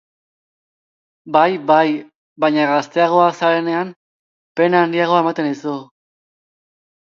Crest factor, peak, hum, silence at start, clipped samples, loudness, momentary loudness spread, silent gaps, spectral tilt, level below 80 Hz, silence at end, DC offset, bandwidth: 18 dB; 0 dBFS; none; 1.25 s; under 0.1%; -16 LUFS; 12 LU; 2.15-2.36 s, 3.96-4.55 s; -6 dB/octave; -70 dBFS; 1.2 s; under 0.1%; 7.4 kHz